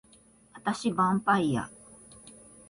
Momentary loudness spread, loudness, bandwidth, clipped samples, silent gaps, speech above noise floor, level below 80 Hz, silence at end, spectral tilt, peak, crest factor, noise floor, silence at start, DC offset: 24 LU; -28 LUFS; 11.5 kHz; under 0.1%; none; 32 dB; -62 dBFS; 0.4 s; -5.5 dB/octave; -12 dBFS; 20 dB; -59 dBFS; 0.55 s; under 0.1%